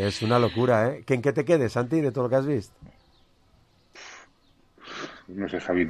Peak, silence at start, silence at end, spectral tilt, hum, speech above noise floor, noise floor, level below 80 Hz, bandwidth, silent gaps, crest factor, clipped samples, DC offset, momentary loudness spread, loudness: -8 dBFS; 0 s; 0 s; -6.5 dB/octave; none; 37 dB; -61 dBFS; -56 dBFS; 13 kHz; none; 18 dB; under 0.1%; under 0.1%; 22 LU; -25 LUFS